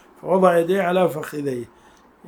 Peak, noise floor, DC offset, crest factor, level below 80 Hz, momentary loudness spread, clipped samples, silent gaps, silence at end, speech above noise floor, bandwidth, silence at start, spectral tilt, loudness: -2 dBFS; -50 dBFS; under 0.1%; 18 dB; -64 dBFS; 13 LU; under 0.1%; none; 0.6 s; 31 dB; 20 kHz; 0.25 s; -6.5 dB/octave; -20 LUFS